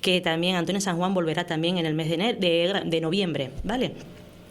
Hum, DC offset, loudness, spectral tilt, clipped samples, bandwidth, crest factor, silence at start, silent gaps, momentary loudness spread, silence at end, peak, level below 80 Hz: none; under 0.1%; -25 LUFS; -5 dB/octave; under 0.1%; 14 kHz; 18 dB; 0 s; none; 7 LU; 0 s; -8 dBFS; -50 dBFS